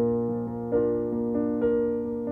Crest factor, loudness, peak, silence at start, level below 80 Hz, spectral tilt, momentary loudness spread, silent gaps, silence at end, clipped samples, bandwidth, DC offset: 12 dB; -27 LUFS; -14 dBFS; 0 s; -52 dBFS; -11.5 dB/octave; 5 LU; none; 0 s; under 0.1%; 3 kHz; under 0.1%